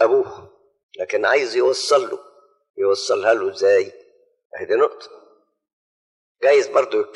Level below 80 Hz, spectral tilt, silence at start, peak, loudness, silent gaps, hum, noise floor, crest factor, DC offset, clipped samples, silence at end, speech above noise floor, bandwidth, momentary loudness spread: -74 dBFS; -2.5 dB/octave; 0 s; -2 dBFS; -19 LUFS; 0.83-0.89 s, 2.70-2.74 s, 4.45-4.50 s, 5.73-6.35 s; none; under -90 dBFS; 18 dB; under 0.1%; under 0.1%; 0.05 s; over 72 dB; 11.5 kHz; 15 LU